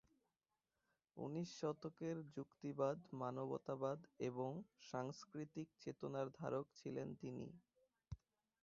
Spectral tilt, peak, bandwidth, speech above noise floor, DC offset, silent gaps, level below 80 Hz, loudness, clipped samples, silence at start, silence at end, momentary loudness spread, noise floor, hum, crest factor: -7 dB/octave; -28 dBFS; 7.4 kHz; over 42 dB; under 0.1%; none; -76 dBFS; -49 LUFS; under 0.1%; 1.15 s; 0.45 s; 10 LU; under -90 dBFS; none; 22 dB